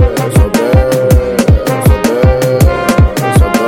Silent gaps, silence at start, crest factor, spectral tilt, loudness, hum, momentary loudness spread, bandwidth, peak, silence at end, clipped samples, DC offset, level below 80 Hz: none; 0 s; 8 dB; -6.5 dB/octave; -10 LUFS; none; 1 LU; 17 kHz; 0 dBFS; 0 s; under 0.1%; under 0.1%; -14 dBFS